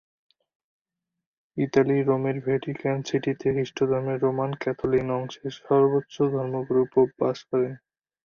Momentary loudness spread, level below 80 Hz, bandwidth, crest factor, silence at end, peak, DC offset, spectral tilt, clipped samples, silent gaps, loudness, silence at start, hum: 8 LU; -60 dBFS; 7 kHz; 18 dB; 0.5 s; -8 dBFS; under 0.1%; -7.5 dB/octave; under 0.1%; none; -25 LUFS; 1.55 s; none